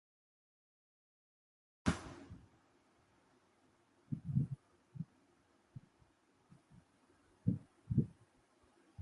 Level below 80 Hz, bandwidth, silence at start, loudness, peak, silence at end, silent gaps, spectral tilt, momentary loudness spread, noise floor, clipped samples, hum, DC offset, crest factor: -60 dBFS; 11 kHz; 1.85 s; -42 LUFS; -20 dBFS; 0 s; none; -7 dB/octave; 21 LU; -73 dBFS; under 0.1%; none; under 0.1%; 26 dB